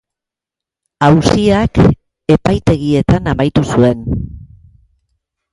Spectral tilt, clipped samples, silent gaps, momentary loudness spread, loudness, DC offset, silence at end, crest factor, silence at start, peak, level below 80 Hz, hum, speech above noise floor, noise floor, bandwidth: -7 dB/octave; under 0.1%; none; 10 LU; -13 LUFS; under 0.1%; 1.1 s; 14 dB; 1 s; 0 dBFS; -30 dBFS; none; 75 dB; -86 dBFS; 11.5 kHz